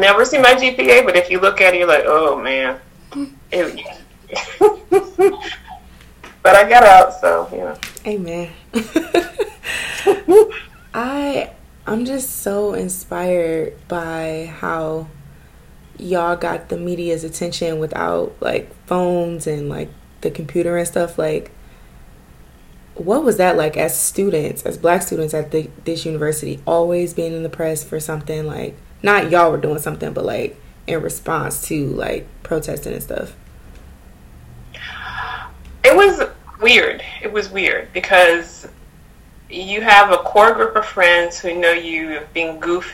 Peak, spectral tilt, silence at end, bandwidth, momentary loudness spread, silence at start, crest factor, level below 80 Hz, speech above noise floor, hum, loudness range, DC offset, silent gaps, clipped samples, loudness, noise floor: 0 dBFS; -4 dB/octave; 0 s; 17 kHz; 17 LU; 0 s; 16 dB; -44 dBFS; 28 dB; none; 11 LU; under 0.1%; none; 0.1%; -16 LUFS; -43 dBFS